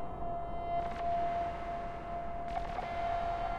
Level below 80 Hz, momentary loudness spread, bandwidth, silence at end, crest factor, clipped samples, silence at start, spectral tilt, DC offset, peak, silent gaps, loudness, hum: -46 dBFS; 6 LU; 8.8 kHz; 0 s; 12 dB; under 0.1%; 0 s; -6.5 dB/octave; under 0.1%; -24 dBFS; none; -37 LUFS; none